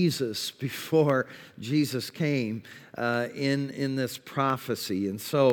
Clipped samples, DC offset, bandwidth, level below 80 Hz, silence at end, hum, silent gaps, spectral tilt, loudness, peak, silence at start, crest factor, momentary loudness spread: under 0.1%; under 0.1%; 19.5 kHz; -76 dBFS; 0 s; none; none; -5.5 dB/octave; -28 LUFS; -10 dBFS; 0 s; 18 dB; 9 LU